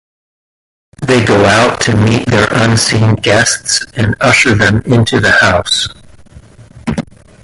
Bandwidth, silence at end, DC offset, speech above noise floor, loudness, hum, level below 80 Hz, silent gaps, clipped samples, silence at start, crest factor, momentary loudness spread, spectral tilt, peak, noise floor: 11.5 kHz; 0.4 s; under 0.1%; 27 dB; -10 LUFS; none; -34 dBFS; none; under 0.1%; 1 s; 12 dB; 12 LU; -4 dB/octave; 0 dBFS; -37 dBFS